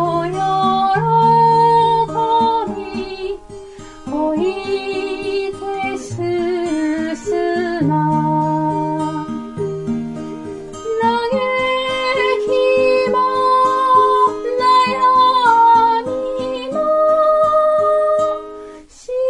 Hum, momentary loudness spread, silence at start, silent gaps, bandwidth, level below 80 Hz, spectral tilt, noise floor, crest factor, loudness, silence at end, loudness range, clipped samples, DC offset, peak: none; 14 LU; 0 s; none; 11.5 kHz; -48 dBFS; -6 dB/octave; -36 dBFS; 14 dB; -16 LUFS; 0 s; 8 LU; under 0.1%; under 0.1%; -2 dBFS